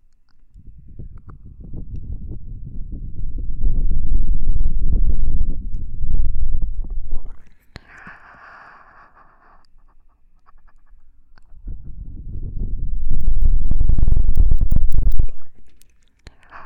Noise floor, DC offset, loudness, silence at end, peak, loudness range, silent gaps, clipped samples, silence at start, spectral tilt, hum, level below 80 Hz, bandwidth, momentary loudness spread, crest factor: -49 dBFS; under 0.1%; -26 LUFS; 0.05 s; 0 dBFS; 21 LU; none; under 0.1%; 0.75 s; -9 dB/octave; none; -20 dBFS; 1.8 kHz; 21 LU; 12 dB